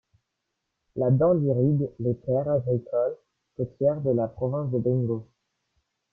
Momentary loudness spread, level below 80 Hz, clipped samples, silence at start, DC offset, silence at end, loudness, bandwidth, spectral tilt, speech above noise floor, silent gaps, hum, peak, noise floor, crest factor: 12 LU; -58 dBFS; under 0.1%; 0.95 s; under 0.1%; 0.9 s; -26 LUFS; 1.9 kHz; -13.5 dB/octave; 57 dB; none; none; -10 dBFS; -81 dBFS; 16 dB